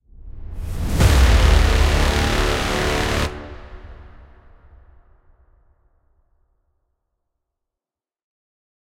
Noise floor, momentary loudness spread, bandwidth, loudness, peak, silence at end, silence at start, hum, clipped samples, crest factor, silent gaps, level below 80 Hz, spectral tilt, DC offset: -90 dBFS; 23 LU; 16 kHz; -18 LUFS; -2 dBFS; 4.95 s; 0.25 s; none; under 0.1%; 18 dB; none; -22 dBFS; -5 dB/octave; under 0.1%